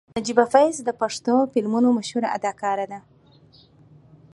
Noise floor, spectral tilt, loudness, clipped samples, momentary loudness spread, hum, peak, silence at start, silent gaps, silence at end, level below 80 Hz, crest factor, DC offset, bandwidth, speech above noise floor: -53 dBFS; -4.5 dB/octave; -22 LUFS; under 0.1%; 8 LU; none; -2 dBFS; 0.15 s; none; 1.35 s; -64 dBFS; 22 dB; under 0.1%; 11.5 kHz; 32 dB